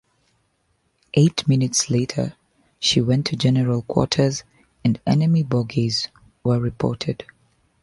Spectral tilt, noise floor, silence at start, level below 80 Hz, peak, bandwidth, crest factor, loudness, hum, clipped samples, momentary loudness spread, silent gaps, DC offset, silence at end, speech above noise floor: -5.5 dB/octave; -68 dBFS; 1.15 s; -50 dBFS; -2 dBFS; 11.5 kHz; 20 dB; -21 LUFS; none; under 0.1%; 9 LU; none; under 0.1%; 0.6 s; 48 dB